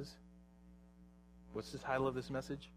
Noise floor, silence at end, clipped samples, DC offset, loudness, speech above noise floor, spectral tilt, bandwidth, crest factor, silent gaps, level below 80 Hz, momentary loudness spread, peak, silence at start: -62 dBFS; 0 s; under 0.1%; under 0.1%; -42 LUFS; 21 dB; -6 dB/octave; 15.5 kHz; 22 dB; none; -64 dBFS; 25 LU; -22 dBFS; 0 s